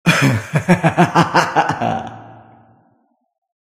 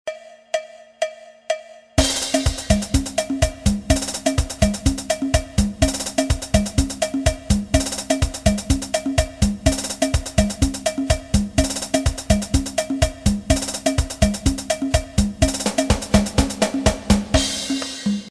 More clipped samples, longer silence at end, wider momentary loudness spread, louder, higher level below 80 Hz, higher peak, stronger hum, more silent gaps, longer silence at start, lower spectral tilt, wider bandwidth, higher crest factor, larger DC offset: neither; first, 1.45 s vs 0 s; first, 8 LU vs 5 LU; first, -15 LUFS vs -21 LUFS; second, -52 dBFS vs -26 dBFS; about the same, 0 dBFS vs -2 dBFS; neither; neither; about the same, 0.05 s vs 0.05 s; about the same, -5.5 dB/octave vs -4.5 dB/octave; first, 15.5 kHz vs 14 kHz; about the same, 18 dB vs 18 dB; neither